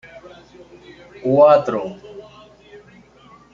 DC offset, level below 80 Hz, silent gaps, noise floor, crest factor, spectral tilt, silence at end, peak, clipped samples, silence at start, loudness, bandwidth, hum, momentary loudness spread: under 0.1%; -60 dBFS; none; -48 dBFS; 20 dB; -7.5 dB/octave; 1.3 s; -2 dBFS; under 0.1%; 1.2 s; -15 LUFS; 7 kHz; none; 27 LU